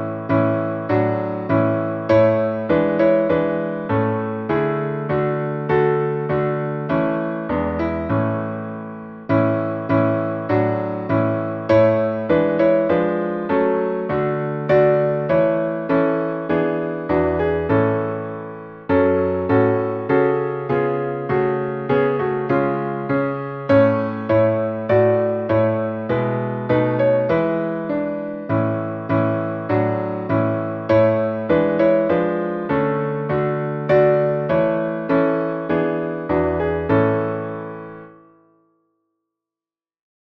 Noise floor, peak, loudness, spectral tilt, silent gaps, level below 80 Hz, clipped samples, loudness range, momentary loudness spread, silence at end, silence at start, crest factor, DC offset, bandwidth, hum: under -90 dBFS; -4 dBFS; -19 LUFS; -10.5 dB/octave; none; -48 dBFS; under 0.1%; 3 LU; 7 LU; 2.15 s; 0 s; 16 dB; under 0.1%; 5.8 kHz; none